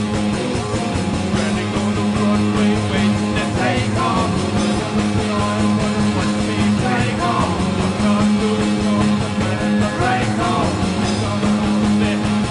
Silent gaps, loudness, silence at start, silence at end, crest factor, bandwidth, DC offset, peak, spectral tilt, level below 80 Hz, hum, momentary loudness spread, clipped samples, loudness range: none; -18 LUFS; 0 s; 0 s; 12 dB; 11 kHz; under 0.1%; -4 dBFS; -5.5 dB/octave; -36 dBFS; none; 3 LU; under 0.1%; 1 LU